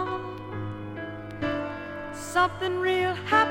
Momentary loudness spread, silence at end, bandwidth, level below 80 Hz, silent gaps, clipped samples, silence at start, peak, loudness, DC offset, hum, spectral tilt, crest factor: 12 LU; 0 s; 16.5 kHz; -54 dBFS; none; under 0.1%; 0 s; -8 dBFS; -28 LUFS; under 0.1%; none; -5 dB/octave; 20 dB